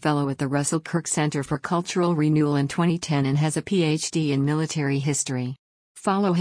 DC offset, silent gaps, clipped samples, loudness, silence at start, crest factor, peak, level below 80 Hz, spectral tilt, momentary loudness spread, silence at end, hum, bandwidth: under 0.1%; 5.59-5.95 s; under 0.1%; -24 LUFS; 0 s; 14 dB; -10 dBFS; -60 dBFS; -5.5 dB/octave; 5 LU; 0 s; none; 10.5 kHz